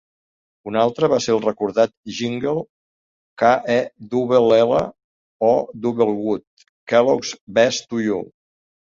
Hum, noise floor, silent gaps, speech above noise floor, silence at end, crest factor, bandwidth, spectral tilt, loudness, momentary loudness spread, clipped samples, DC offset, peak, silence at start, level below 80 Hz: none; under -90 dBFS; 1.97-2.03 s, 2.70-3.37 s, 5.04-5.40 s, 6.47-6.57 s, 6.69-6.87 s, 7.41-7.47 s; over 72 dB; 0.75 s; 18 dB; 7.6 kHz; -5 dB/octave; -19 LUFS; 11 LU; under 0.1%; under 0.1%; -2 dBFS; 0.65 s; -58 dBFS